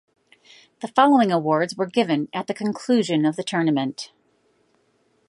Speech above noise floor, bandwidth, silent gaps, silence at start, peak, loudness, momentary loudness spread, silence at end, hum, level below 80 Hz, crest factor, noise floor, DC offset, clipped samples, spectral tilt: 44 dB; 11.5 kHz; none; 0.8 s; -2 dBFS; -21 LUFS; 12 LU; 1.25 s; none; -74 dBFS; 20 dB; -65 dBFS; under 0.1%; under 0.1%; -5.5 dB/octave